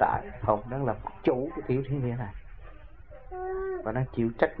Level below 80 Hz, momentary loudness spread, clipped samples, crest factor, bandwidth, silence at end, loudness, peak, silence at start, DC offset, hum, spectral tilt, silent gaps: -48 dBFS; 22 LU; under 0.1%; 24 dB; 4.7 kHz; 0 s; -31 LUFS; -6 dBFS; 0 s; 0.4%; none; -11 dB/octave; none